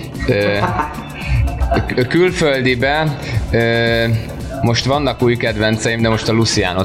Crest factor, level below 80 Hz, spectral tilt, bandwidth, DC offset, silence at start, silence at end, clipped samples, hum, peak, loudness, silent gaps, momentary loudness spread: 12 dB; -26 dBFS; -5.5 dB/octave; 15 kHz; under 0.1%; 0 s; 0 s; under 0.1%; none; -4 dBFS; -16 LUFS; none; 6 LU